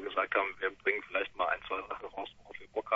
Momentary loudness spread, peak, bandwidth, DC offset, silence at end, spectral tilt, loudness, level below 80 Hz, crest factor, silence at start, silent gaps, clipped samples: 12 LU; -14 dBFS; 7.6 kHz; under 0.1%; 0 s; 0.5 dB/octave; -34 LUFS; -66 dBFS; 20 dB; 0 s; none; under 0.1%